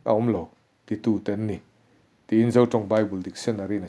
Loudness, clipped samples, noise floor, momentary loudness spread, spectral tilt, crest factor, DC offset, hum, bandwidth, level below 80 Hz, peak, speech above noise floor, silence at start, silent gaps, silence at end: -24 LUFS; under 0.1%; -61 dBFS; 12 LU; -7.5 dB/octave; 20 dB; under 0.1%; none; 11 kHz; -62 dBFS; -6 dBFS; 38 dB; 0.05 s; none; 0 s